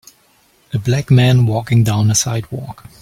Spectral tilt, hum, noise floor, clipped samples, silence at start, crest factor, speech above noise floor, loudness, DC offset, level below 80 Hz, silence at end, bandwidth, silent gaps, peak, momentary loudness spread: -5 dB/octave; none; -54 dBFS; under 0.1%; 0.75 s; 14 dB; 40 dB; -15 LUFS; under 0.1%; -44 dBFS; 0.3 s; 15.5 kHz; none; -2 dBFS; 16 LU